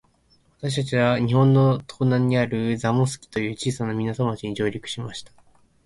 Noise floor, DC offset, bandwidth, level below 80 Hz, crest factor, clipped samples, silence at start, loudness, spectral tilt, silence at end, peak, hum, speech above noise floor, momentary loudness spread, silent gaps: -61 dBFS; under 0.1%; 11.5 kHz; -54 dBFS; 16 dB; under 0.1%; 0.6 s; -23 LUFS; -6.5 dB/octave; 0.6 s; -6 dBFS; none; 39 dB; 13 LU; none